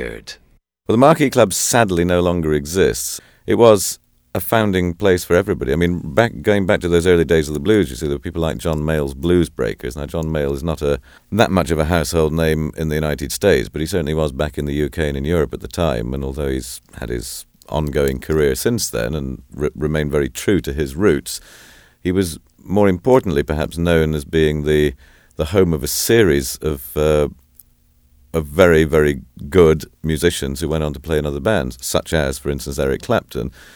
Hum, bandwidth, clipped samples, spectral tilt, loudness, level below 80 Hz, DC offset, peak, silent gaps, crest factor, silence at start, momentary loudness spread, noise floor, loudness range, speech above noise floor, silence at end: none; over 20 kHz; under 0.1%; -5.5 dB/octave; -18 LUFS; -32 dBFS; under 0.1%; 0 dBFS; none; 18 dB; 0 s; 11 LU; -55 dBFS; 5 LU; 38 dB; 0.1 s